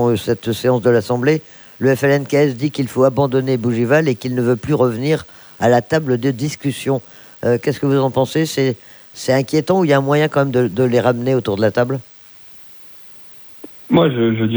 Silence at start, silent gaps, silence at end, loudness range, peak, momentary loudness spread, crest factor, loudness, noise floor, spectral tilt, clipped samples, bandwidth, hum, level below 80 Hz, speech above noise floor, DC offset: 0 s; none; 0 s; 3 LU; 0 dBFS; 21 LU; 16 dB; -17 LUFS; -41 dBFS; -6.5 dB/octave; under 0.1%; over 20 kHz; none; -54 dBFS; 25 dB; under 0.1%